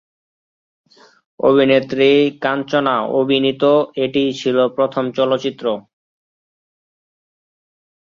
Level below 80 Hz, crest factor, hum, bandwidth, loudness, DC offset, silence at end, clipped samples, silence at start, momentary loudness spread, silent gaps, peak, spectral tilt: -62 dBFS; 16 dB; none; 7.4 kHz; -16 LUFS; under 0.1%; 2.3 s; under 0.1%; 1.4 s; 7 LU; none; -2 dBFS; -6 dB/octave